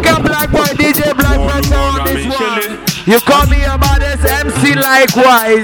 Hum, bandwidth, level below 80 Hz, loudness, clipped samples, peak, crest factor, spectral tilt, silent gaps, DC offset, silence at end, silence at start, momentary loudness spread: none; 17.5 kHz; -18 dBFS; -11 LUFS; under 0.1%; 0 dBFS; 10 dB; -4.5 dB/octave; none; under 0.1%; 0 s; 0 s; 7 LU